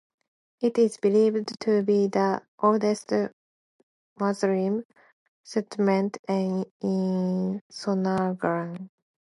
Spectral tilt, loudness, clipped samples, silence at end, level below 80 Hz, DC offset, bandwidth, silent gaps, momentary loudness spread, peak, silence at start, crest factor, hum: -7 dB/octave; -26 LUFS; under 0.1%; 0.4 s; -72 dBFS; under 0.1%; 11.5 kHz; 2.48-2.58 s, 3.33-4.16 s, 4.85-4.90 s, 5.13-5.44 s, 6.19-6.24 s, 6.71-6.80 s, 7.61-7.70 s; 9 LU; -8 dBFS; 0.6 s; 18 dB; none